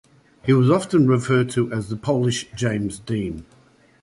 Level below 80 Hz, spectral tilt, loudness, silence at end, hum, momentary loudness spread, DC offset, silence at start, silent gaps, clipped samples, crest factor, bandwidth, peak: -50 dBFS; -6.5 dB/octave; -21 LUFS; 0.6 s; none; 9 LU; under 0.1%; 0.45 s; none; under 0.1%; 16 dB; 11.5 kHz; -4 dBFS